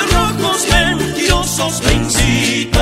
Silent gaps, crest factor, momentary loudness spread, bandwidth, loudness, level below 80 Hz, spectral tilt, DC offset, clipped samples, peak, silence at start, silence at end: none; 14 dB; 3 LU; 16.5 kHz; -14 LUFS; -22 dBFS; -3.5 dB/octave; under 0.1%; under 0.1%; 0 dBFS; 0 s; 0 s